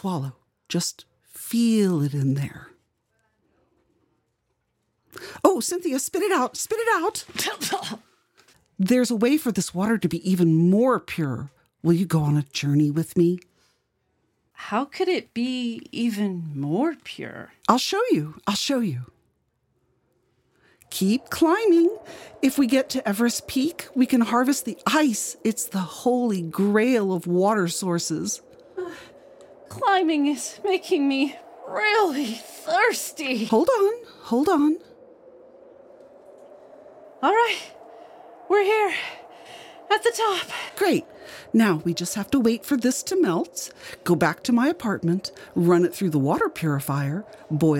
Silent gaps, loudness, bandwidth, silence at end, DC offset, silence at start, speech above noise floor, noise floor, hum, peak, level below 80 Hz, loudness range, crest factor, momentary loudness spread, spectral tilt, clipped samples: none; -23 LUFS; 17 kHz; 0 s; under 0.1%; 0.05 s; 51 dB; -74 dBFS; none; -2 dBFS; -64 dBFS; 5 LU; 22 dB; 14 LU; -5 dB/octave; under 0.1%